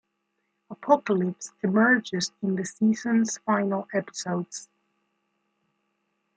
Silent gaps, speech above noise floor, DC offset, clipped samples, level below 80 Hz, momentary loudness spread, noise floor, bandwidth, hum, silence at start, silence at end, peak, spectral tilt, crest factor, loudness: none; 52 dB; under 0.1%; under 0.1%; -76 dBFS; 10 LU; -77 dBFS; 9.4 kHz; none; 0.7 s; 1.75 s; -6 dBFS; -5 dB/octave; 22 dB; -25 LUFS